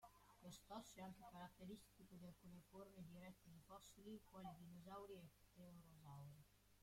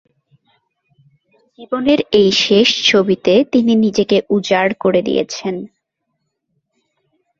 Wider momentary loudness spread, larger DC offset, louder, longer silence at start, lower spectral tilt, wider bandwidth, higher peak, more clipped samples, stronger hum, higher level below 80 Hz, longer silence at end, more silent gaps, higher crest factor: second, 7 LU vs 10 LU; neither; second, -62 LUFS vs -14 LUFS; second, 0 s vs 1.6 s; about the same, -5.5 dB/octave vs -4.5 dB/octave; first, 16.5 kHz vs 7.6 kHz; second, -42 dBFS vs 0 dBFS; neither; first, 50 Hz at -75 dBFS vs none; second, -78 dBFS vs -54 dBFS; second, 0 s vs 1.75 s; neither; about the same, 20 dB vs 16 dB